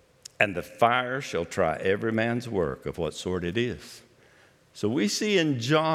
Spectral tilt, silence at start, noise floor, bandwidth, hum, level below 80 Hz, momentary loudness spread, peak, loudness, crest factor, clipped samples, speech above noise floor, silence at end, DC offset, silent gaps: -5 dB/octave; 0.4 s; -58 dBFS; 15.5 kHz; none; -58 dBFS; 8 LU; -4 dBFS; -27 LUFS; 24 dB; under 0.1%; 32 dB; 0 s; under 0.1%; none